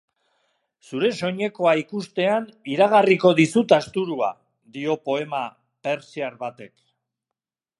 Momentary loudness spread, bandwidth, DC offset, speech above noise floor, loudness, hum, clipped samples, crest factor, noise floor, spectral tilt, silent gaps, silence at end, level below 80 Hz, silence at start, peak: 15 LU; 11.5 kHz; under 0.1%; 66 dB; -22 LUFS; none; under 0.1%; 20 dB; -87 dBFS; -5.5 dB/octave; none; 1.1 s; -70 dBFS; 0.9 s; -2 dBFS